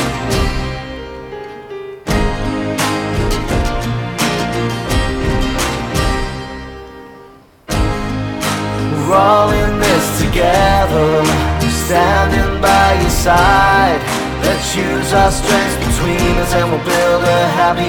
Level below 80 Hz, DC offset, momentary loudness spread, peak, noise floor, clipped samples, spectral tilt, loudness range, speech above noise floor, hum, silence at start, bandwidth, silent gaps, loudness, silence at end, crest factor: -24 dBFS; under 0.1%; 13 LU; 0 dBFS; -41 dBFS; under 0.1%; -4.5 dB/octave; 7 LU; 29 dB; none; 0 s; 19 kHz; none; -14 LUFS; 0 s; 14 dB